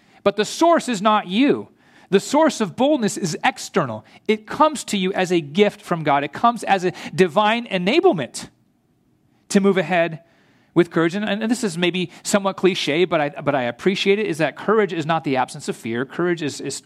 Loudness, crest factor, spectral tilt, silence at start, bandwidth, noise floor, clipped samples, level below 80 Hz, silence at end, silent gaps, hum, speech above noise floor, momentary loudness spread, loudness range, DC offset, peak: -20 LUFS; 18 dB; -5 dB/octave; 0.25 s; 14.5 kHz; -62 dBFS; under 0.1%; -66 dBFS; 0.05 s; none; none; 42 dB; 8 LU; 2 LU; under 0.1%; -2 dBFS